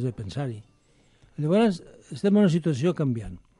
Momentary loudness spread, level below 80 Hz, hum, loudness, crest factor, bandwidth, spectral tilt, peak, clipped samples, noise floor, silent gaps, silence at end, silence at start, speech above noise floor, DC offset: 17 LU; -54 dBFS; none; -25 LUFS; 14 dB; 11 kHz; -7.5 dB/octave; -10 dBFS; under 0.1%; -61 dBFS; none; 0.2 s; 0 s; 37 dB; under 0.1%